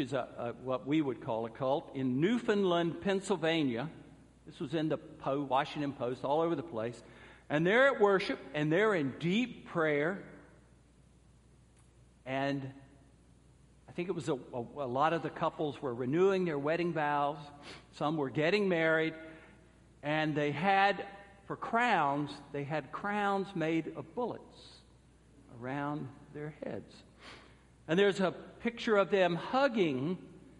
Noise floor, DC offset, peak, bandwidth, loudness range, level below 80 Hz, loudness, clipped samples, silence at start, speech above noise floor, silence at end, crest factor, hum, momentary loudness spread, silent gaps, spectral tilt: -62 dBFS; under 0.1%; -14 dBFS; 11.5 kHz; 10 LU; -68 dBFS; -33 LUFS; under 0.1%; 0 s; 30 dB; 0.2 s; 20 dB; none; 16 LU; none; -6.5 dB/octave